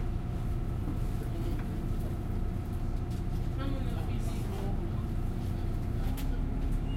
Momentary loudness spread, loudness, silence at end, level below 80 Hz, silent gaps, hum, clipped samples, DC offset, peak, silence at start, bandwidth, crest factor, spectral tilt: 1 LU; -35 LUFS; 0 s; -34 dBFS; none; none; under 0.1%; under 0.1%; -20 dBFS; 0 s; 15.5 kHz; 12 dB; -7.5 dB/octave